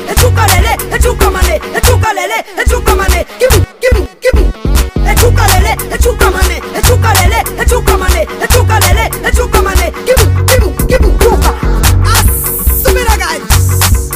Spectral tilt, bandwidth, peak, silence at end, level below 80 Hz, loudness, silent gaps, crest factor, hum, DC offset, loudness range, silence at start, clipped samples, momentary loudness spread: -4 dB/octave; 16.5 kHz; 0 dBFS; 0 s; -12 dBFS; -9 LUFS; none; 8 dB; none; under 0.1%; 1 LU; 0 s; 0.3%; 5 LU